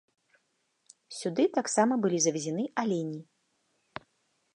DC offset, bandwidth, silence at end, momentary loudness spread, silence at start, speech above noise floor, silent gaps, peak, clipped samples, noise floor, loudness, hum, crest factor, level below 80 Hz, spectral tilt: under 0.1%; 11.5 kHz; 1.35 s; 20 LU; 1.1 s; 47 dB; none; -12 dBFS; under 0.1%; -76 dBFS; -29 LUFS; none; 20 dB; -78 dBFS; -4 dB/octave